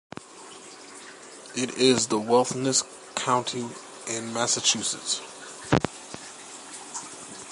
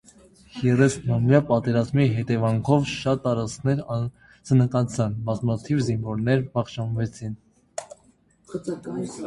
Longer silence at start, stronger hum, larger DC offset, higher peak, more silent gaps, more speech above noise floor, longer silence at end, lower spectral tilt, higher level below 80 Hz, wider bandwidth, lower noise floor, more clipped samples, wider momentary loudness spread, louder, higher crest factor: second, 0.15 s vs 0.55 s; neither; neither; about the same, -4 dBFS vs -2 dBFS; neither; second, 20 dB vs 37 dB; about the same, 0 s vs 0 s; second, -3 dB/octave vs -7 dB/octave; second, -58 dBFS vs -52 dBFS; about the same, 11.5 kHz vs 11.5 kHz; second, -45 dBFS vs -60 dBFS; neither; first, 21 LU vs 16 LU; about the same, -25 LUFS vs -24 LUFS; about the same, 24 dB vs 20 dB